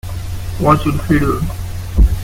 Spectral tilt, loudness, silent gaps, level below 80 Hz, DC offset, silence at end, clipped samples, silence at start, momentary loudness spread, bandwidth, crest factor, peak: -7 dB/octave; -17 LUFS; none; -18 dBFS; under 0.1%; 0 s; under 0.1%; 0.05 s; 12 LU; 16.5 kHz; 14 dB; 0 dBFS